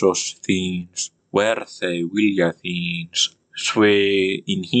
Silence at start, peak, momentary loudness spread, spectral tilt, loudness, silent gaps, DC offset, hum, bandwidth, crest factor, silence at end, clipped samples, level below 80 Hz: 0 s; -4 dBFS; 9 LU; -4 dB/octave; -21 LUFS; none; under 0.1%; none; 9.2 kHz; 16 dB; 0 s; under 0.1%; -68 dBFS